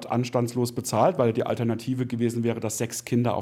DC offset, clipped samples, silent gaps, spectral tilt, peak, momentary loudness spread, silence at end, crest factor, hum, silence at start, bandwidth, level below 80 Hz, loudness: under 0.1%; under 0.1%; none; -6 dB/octave; -8 dBFS; 6 LU; 0 s; 16 dB; none; 0 s; 16.5 kHz; -68 dBFS; -26 LUFS